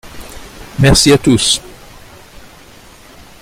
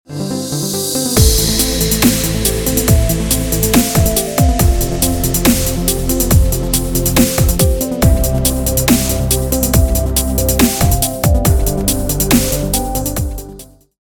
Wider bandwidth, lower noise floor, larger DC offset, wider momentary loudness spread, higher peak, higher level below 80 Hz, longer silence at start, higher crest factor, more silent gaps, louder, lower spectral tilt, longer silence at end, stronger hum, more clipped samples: second, 16 kHz vs over 20 kHz; about the same, -39 dBFS vs -36 dBFS; neither; first, 24 LU vs 5 LU; about the same, 0 dBFS vs 0 dBFS; second, -30 dBFS vs -20 dBFS; about the same, 0.05 s vs 0.1 s; about the same, 16 dB vs 14 dB; neither; first, -10 LUFS vs -13 LUFS; about the same, -4 dB/octave vs -4.5 dB/octave; first, 1.75 s vs 0.4 s; neither; neither